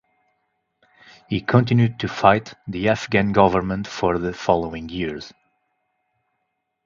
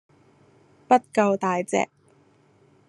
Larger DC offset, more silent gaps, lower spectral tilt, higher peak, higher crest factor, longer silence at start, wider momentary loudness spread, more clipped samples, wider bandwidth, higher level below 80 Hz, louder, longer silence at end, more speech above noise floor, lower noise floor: neither; neither; first, -7 dB/octave vs -5.5 dB/octave; first, 0 dBFS vs -4 dBFS; about the same, 22 dB vs 22 dB; first, 1.3 s vs 0.9 s; first, 12 LU vs 6 LU; neither; second, 7.4 kHz vs 12 kHz; first, -46 dBFS vs -74 dBFS; first, -20 LUFS vs -23 LUFS; first, 1.55 s vs 1.05 s; first, 56 dB vs 37 dB; first, -75 dBFS vs -59 dBFS